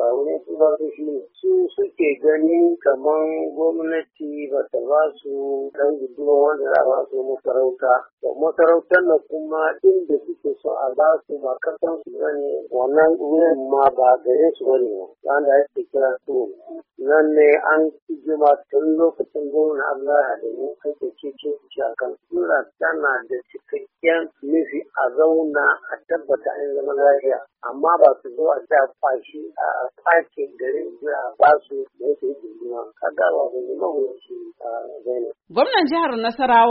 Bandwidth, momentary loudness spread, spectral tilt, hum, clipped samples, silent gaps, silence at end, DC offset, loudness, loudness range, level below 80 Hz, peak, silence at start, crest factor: 5.2 kHz; 12 LU; -1.5 dB/octave; none; under 0.1%; 8.13-8.18 s, 18.02-18.07 s; 0 s; under 0.1%; -20 LUFS; 5 LU; -70 dBFS; 0 dBFS; 0 s; 20 dB